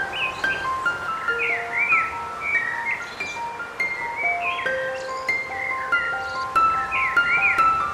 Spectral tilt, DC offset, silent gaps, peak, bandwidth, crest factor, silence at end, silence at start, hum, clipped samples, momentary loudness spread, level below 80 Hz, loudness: -2.5 dB/octave; under 0.1%; none; -8 dBFS; 15 kHz; 16 dB; 0 s; 0 s; none; under 0.1%; 9 LU; -54 dBFS; -22 LUFS